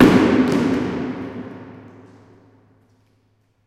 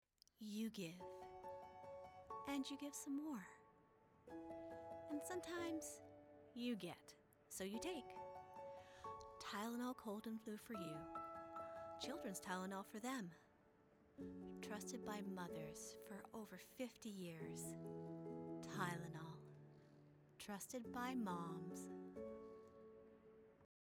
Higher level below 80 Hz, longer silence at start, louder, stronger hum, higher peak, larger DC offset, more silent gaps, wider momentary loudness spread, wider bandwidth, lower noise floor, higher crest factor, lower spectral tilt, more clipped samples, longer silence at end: first, -46 dBFS vs -80 dBFS; second, 0 s vs 0.4 s; first, -19 LUFS vs -52 LUFS; neither; first, 0 dBFS vs -32 dBFS; neither; neither; first, 25 LU vs 15 LU; second, 14 kHz vs over 20 kHz; second, -62 dBFS vs -73 dBFS; about the same, 20 dB vs 20 dB; first, -7 dB/octave vs -4.5 dB/octave; neither; first, 1.9 s vs 0.2 s